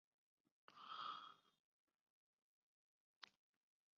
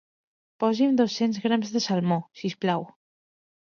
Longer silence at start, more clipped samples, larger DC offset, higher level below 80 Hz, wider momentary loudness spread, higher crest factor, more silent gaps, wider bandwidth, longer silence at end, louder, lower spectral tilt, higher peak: about the same, 0.7 s vs 0.6 s; neither; neither; second, under -90 dBFS vs -74 dBFS; first, 14 LU vs 8 LU; first, 24 dB vs 18 dB; first, 1.59-1.87 s, 1.94-3.21 s vs none; about the same, 6.8 kHz vs 7.2 kHz; about the same, 0.7 s vs 0.8 s; second, -56 LUFS vs -25 LUFS; second, 2 dB/octave vs -6 dB/octave; second, -38 dBFS vs -10 dBFS